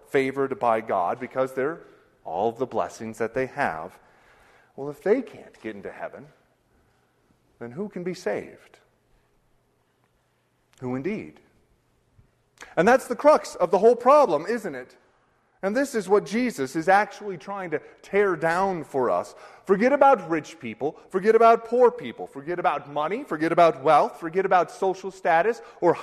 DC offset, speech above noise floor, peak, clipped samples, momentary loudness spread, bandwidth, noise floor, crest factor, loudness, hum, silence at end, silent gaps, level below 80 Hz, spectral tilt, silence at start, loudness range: under 0.1%; 45 dB; -4 dBFS; under 0.1%; 18 LU; 13.5 kHz; -68 dBFS; 20 dB; -23 LUFS; none; 0 s; none; -64 dBFS; -5.5 dB/octave; 0.15 s; 15 LU